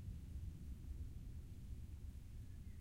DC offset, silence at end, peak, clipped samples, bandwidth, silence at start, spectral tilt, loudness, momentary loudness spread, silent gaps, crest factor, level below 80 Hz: under 0.1%; 0 s; -38 dBFS; under 0.1%; 16 kHz; 0 s; -7 dB/octave; -54 LUFS; 3 LU; none; 12 dB; -54 dBFS